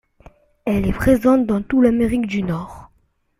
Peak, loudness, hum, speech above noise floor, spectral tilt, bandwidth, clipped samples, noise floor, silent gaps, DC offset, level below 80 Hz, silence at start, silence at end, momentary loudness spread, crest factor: -4 dBFS; -18 LUFS; none; 44 dB; -7.5 dB/octave; 15.5 kHz; under 0.1%; -61 dBFS; none; under 0.1%; -36 dBFS; 0.65 s; 0.55 s; 12 LU; 16 dB